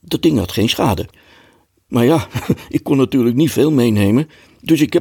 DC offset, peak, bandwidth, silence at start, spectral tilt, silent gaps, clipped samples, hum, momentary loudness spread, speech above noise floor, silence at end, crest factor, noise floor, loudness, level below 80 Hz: under 0.1%; -2 dBFS; 18 kHz; 0.1 s; -6 dB/octave; none; under 0.1%; none; 8 LU; 38 dB; 0 s; 14 dB; -53 dBFS; -16 LUFS; -46 dBFS